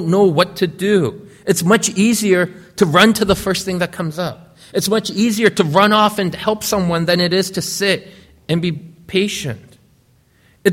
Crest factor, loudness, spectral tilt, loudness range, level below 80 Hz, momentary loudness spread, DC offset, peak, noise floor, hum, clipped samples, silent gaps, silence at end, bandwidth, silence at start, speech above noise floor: 16 dB; -16 LUFS; -4.5 dB/octave; 4 LU; -46 dBFS; 11 LU; under 0.1%; 0 dBFS; -54 dBFS; none; under 0.1%; none; 0 s; 16.5 kHz; 0 s; 39 dB